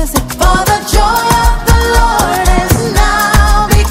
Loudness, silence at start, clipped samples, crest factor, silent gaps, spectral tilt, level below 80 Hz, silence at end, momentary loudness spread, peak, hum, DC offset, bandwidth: -10 LUFS; 0 s; 0.7%; 8 dB; none; -4 dB/octave; -12 dBFS; 0 s; 2 LU; 0 dBFS; none; under 0.1%; 16.5 kHz